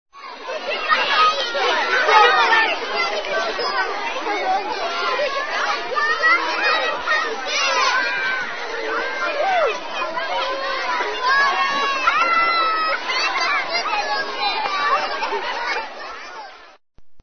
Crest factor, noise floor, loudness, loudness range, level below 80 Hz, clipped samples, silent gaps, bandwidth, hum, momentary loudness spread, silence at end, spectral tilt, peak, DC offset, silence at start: 20 dB; -45 dBFS; -19 LUFS; 5 LU; -54 dBFS; under 0.1%; none; 6.6 kHz; none; 9 LU; 0 s; -0.5 dB/octave; 0 dBFS; 1%; 0.05 s